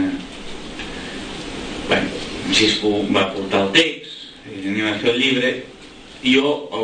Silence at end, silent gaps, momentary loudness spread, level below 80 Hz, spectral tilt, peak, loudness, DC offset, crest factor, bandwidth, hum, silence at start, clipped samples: 0 s; none; 18 LU; -44 dBFS; -3.5 dB/octave; -2 dBFS; -19 LUFS; under 0.1%; 20 dB; 9.8 kHz; none; 0 s; under 0.1%